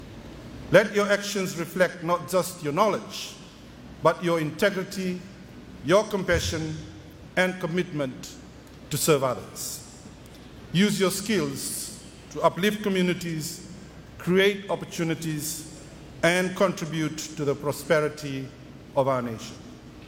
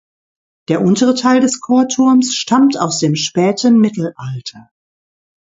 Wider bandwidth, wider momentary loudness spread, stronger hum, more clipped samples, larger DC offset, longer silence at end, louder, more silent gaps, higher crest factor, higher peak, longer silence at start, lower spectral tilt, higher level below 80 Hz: first, 17 kHz vs 7.8 kHz; first, 22 LU vs 11 LU; neither; neither; neither; second, 0 s vs 0.8 s; second, -26 LUFS vs -13 LUFS; neither; first, 24 dB vs 14 dB; second, -4 dBFS vs 0 dBFS; second, 0 s vs 0.7 s; about the same, -4.5 dB/octave vs -5 dB/octave; first, -52 dBFS vs -60 dBFS